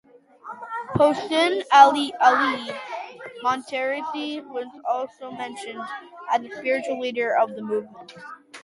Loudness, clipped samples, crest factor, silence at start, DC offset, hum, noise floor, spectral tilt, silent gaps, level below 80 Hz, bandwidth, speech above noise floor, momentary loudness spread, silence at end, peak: -22 LUFS; under 0.1%; 22 dB; 0.45 s; under 0.1%; none; -42 dBFS; -4.5 dB/octave; none; -62 dBFS; 11.5 kHz; 20 dB; 19 LU; 0.05 s; 0 dBFS